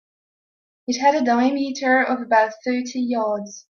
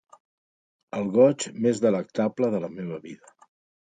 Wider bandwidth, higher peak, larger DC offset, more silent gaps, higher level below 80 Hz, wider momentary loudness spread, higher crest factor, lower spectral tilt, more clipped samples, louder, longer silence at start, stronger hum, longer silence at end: second, 7.2 kHz vs 9.4 kHz; about the same, -4 dBFS vs -6 dBFS; neither; neither; about the same, -70 dBFS vs -70 dBFS; second, 8 LU vs 16 LU; about the same, 16 dB vs 20 dB; second, -3.5 dB/octave vs -6 dB/octave; neither; first, -20 LUFS vs -25 LUFS; about the same, 0.9 s vs 0.95 s; neither; second, 0.15 s vs 0.7 s